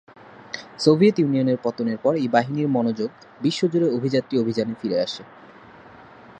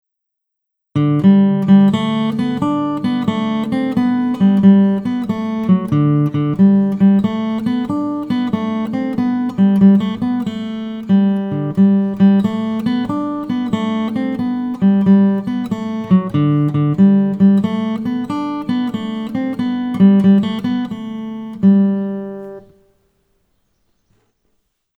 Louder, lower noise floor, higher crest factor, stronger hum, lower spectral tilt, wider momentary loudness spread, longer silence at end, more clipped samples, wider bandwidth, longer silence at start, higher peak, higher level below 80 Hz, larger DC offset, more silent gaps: second, -22 LUFS vs -15 LUFS; second, -46 dBFS vs -78 dBFS; first, 20 dB vs 14 dB; neither; second, -6.5 dB/octave vs -9 dB/octave; about the same, 12 LU vs 10 LU; second, 0.4 s vs 2.4 s; neither; first, 9.2 kHz vs 4.8 kHz; second, 0.4 s vs 0.95 s; about the same, -2 dBFS vs 0 dBFS; second, -66 dBFS vs -54 dBFS; neither; neither